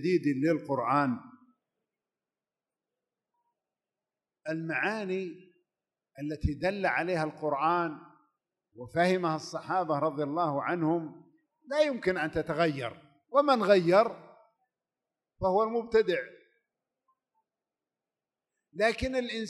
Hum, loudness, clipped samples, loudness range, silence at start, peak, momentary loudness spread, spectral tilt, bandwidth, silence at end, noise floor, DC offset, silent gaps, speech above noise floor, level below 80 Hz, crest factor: none; -29 LUFS; under 0.1%; 10 LU; 0 s; -10 dBFS; 13 LU; -6.5 dB/octave; 12 kHz; 0 s; under -90 dBFS; under 0.1%; none; over 61 dB; -54 dBFS; 22 dB